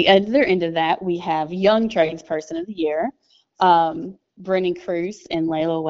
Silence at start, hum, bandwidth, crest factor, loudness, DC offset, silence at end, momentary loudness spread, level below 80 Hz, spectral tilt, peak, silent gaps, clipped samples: 0 s; none; 7.8 kHz; 20 dB; -20 LUFS; under 0.1%; 0 s; 12 LU; -58 dBFS; -3.5 dB/octave; 0 dBFS; none; under 0.1%